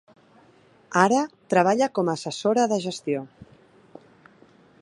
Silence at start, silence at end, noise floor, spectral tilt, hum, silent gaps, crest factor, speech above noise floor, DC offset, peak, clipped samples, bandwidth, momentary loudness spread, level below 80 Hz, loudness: 0.9 s; 1.35 s; -56 dBFS; -5 dB/octave; none; none; 24 dB; 34 dB; under 0.1%; -2 dBFS; under 0.1%; 11.5 kHz; 10 LU; -70 dBFS; -23 LUFS